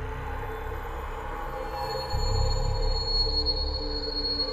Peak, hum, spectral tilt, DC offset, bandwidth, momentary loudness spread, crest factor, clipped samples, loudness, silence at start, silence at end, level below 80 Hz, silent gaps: -14 dBFS; none; -4.5 dB/octave; under 0.1%; 14 kHz; 11 LU; 14 dB; under 0.1%; -29 LUFS; 0 s; 0 s; -32 dBFS; none